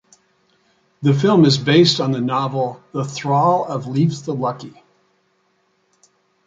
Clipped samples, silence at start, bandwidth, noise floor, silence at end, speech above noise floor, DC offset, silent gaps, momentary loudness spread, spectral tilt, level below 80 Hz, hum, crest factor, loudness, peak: under 0.1%; 1 s; 7.8 kHz; -64 dBFS; 1.75 s; 47 dB; under 0.1%; none; 12 LU; -6 dB/octave; -60 dBFS; none; 18 dB; -17 LUFS; -2 dBFS